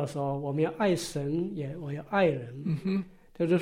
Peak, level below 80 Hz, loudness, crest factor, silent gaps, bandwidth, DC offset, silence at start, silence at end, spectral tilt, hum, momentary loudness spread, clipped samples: -12 dBFS; -58 dBFS; -30 LUFS; 16 dB; none; 16 kHz; under 0.1%; 0 s; 0 s; -6.5 dB/octave; none; 9 LU; under 0.1%